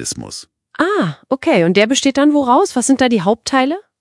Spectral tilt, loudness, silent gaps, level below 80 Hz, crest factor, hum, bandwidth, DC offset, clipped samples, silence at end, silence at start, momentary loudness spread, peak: -4 dB/octave; -14 LUFS; none; -56 dBFS; 14 dB; none; 12 kHz; under 0.1%; under 0.1%; 0.2 s; 0 s; 12 LU; 0 dBFS